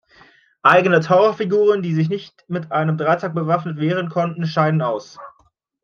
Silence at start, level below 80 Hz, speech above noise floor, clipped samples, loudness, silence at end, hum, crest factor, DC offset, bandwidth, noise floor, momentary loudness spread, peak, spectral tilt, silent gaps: 0.65 s; -66 dBFS; 43 dB; under 0.1%; -18 LUFS; 0.55 s; none; 18 dB; under 0.1%; 7 kHz; -61 dBFS; 11 LU; -2 dBFS; -7.5 dB/octave; none